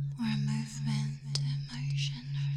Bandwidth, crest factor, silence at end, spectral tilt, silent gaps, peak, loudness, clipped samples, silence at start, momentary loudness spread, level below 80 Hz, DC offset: 10.5 kHz; 20 dB; 0 s; -5 dB/octave; none; -14 dBFS; -34 LUFS; under 0.1%; 0 s; 3 LU; -60 dBFS; under 0.1%